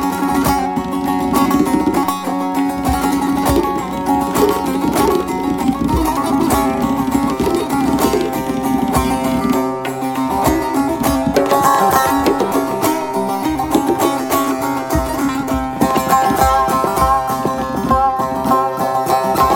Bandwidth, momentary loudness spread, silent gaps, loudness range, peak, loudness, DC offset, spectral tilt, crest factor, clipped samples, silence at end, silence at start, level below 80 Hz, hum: 17 kHz; 5 LU; none; 2 LU; 0 dBFS; -16 LUFS; under 0.1%; -5 dB/octave; 16 dB; under 0.1%; 0 s; 0 s; -32 dBFS; none